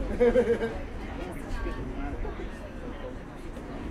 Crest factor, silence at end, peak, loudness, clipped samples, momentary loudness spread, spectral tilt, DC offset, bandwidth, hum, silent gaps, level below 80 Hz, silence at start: 18 dB; 0 s; -12 dBFS; -32 LUFS; under 0.1%; 16 LU; -7 dB/octave; under 0.1%; 12.5 kHz; none; none; -38 dBFS; 0 s